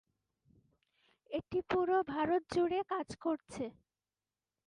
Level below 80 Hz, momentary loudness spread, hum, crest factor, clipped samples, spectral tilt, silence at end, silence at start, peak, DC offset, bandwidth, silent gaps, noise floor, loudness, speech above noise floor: -68 dBFS; 11 LU; none; 18 dB; under 0.1%; -6 dB/octave; 1 s; 1.3 s; -20 dBFS; under 0.1%; 11 kHz; none; under -90 dBFS; -36 LUFS; over 55 dB